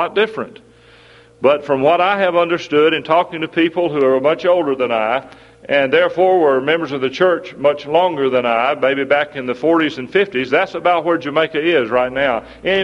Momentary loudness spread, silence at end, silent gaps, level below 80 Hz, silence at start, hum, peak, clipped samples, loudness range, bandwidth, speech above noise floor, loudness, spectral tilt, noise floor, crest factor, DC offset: 5 LU; 0 s; none; -56 dBFS; 0 s; none; 0 dBFS; under 0.1%; 1 LU; 7.6 kHz; 30 dB; -16 LUFS; -6 dB/octave; -45 dBFS; 16 dB; under 0.1%